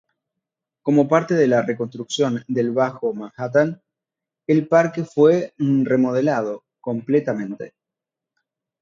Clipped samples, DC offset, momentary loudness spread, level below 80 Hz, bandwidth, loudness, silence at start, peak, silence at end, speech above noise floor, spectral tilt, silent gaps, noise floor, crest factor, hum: under 0.1%; under 0.1%; 13 LU; -68 dBFS; 7.6 kHz; -20 LUFS; 0.85 s; -2 dBFS; 1.15 s; 68 dB; -7 dB/octave; none; -87 dBFS; 20 dB; none